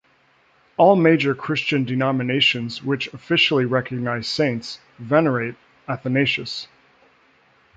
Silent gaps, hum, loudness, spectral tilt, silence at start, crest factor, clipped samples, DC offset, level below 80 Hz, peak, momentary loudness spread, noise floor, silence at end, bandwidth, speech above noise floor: none; none; -20 LUFS; -6 dB/octave; 0.8 s; 18 dB; under 0.1%; under 0.1%; -62 dBFS; -2 dBFS; 14 LU; -59 dBFS; 1.1 s; 9 kHz; 39 dB